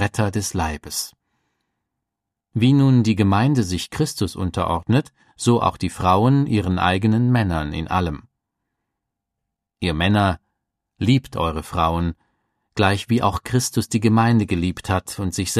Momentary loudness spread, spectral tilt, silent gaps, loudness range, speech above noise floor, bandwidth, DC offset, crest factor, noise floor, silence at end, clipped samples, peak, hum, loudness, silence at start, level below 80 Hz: 10 LU; -6 dB/octave; none; 4 LU; 64 dB; 15 kHz; under 0.1%; 20 dB; -83 dBFS; 0 s; under 0.1%; -2 dBFS; none; -20 LUFS; 0 s; -40 dBFS